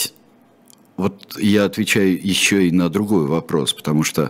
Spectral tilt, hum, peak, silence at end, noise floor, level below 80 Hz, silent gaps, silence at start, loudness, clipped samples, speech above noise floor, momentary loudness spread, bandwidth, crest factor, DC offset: -4.5 dB/octave; none; -2 dBFS; 0 s; -52 dBFS; -54 dBFS; none; 0 s; -18 LUFS; under 0.1%; 34 dB; 9 LU; 16.5 kHz; 16 dB; under 0.1%